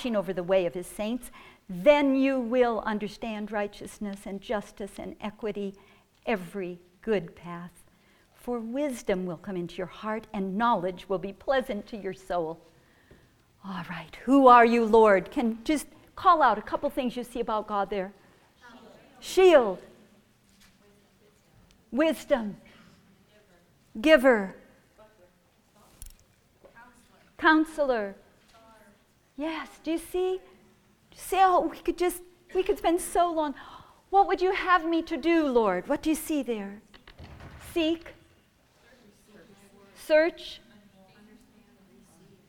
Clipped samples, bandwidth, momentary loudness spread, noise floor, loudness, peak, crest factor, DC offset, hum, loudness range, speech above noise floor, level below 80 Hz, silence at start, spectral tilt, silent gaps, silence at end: under 0.1%; 18 kHz; 19 LU; -64 dBFS; -26 LUFS; -4 dBFS; 24 dB; under 0.1%; none; 12 LU; 38 dB; -56 dBFS; 0 s; -5 dB/octave; none; 1.9 s